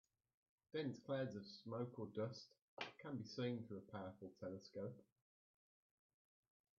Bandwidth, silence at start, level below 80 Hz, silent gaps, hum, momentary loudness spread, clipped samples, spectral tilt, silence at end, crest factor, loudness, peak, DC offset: 7 kHz; 0.75 s; -88 dBFS; 2.62-2.77 s; none; 8 LU; under 0.1%; -5.5 dB/octave; 1.75 s; 22 dB; -50 LUFS; -30 dBFS; under 0.1%